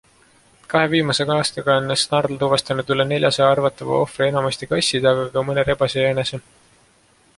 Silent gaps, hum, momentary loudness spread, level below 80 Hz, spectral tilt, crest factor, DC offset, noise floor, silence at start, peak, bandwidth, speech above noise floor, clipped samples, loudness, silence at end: none; none; 5 LU; -52 dBFS; -4.5 dB/octave; 18 dB; under 0.1%; -56 dBFS; 0.7 s; -2 dBFS; 11.5 kHz; 37 dB; under 0.1%; -19 LUFS; 0.95 s